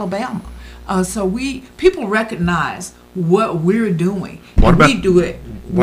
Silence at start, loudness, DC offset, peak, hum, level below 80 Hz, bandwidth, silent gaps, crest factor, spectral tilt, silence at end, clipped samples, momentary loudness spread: 0 s; -16 LUFS; under 0.1%; 0 dBFS; none; -26 dBFS; 15 kHz; none; 16 dB; -6 dB/octave; 0 s; under 0.1%; 16 LU